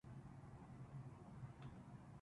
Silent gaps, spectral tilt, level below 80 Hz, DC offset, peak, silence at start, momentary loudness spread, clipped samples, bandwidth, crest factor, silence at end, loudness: none; -8 dB/octave; -70 dBFS; under 0.1%; -44 dBFS; 0.05 s; 3 LU; under 0.1%; 11 kHz; 12 dB; 0 s; -58 LUFS